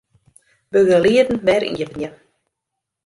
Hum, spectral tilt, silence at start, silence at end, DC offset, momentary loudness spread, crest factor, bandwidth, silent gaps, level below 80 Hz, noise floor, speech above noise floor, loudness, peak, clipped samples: none; -5.5 dB/octave; 0.75 s; 0.95 s; under 0.1%; 15 LU; 16 dB; 11.5 kHz; none; -52 dBFS; -81 dBFS; 65 dB; -17 LUFS; -4 dBFS; under 0.1%